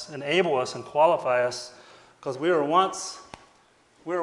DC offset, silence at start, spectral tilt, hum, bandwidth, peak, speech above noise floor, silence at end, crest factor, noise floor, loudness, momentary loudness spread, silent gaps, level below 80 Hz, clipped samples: under 0.1%; 0 s; -4 dB/octave; none; 11.5 kHz; -8 dBFS; 36 dB; 0 s; 18 dB; -60 dBFS; -24 LUFS; 16 LU; none; -72 dBFS; under 0.1%